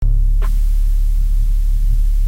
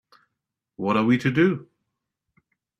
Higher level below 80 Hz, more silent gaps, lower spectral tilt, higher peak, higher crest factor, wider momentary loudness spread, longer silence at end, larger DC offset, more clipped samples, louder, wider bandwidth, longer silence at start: first, -12 dBFS vs -64 dBFS; neither; about the same, -6.5 dB/octave vs -7.5 dB/octave; about the same, -6 dBFS vs -8 dBFS; second, 6 dB vs 18 dB; second, 1 LU vs 11 LU; second, 0 s vs 1.15 s; neither; neither; about the same, -20 LUFS vs -22 LUFS; second, 1.9 kHz vs 8.6 kHz; second, 0 s vs 0.8 s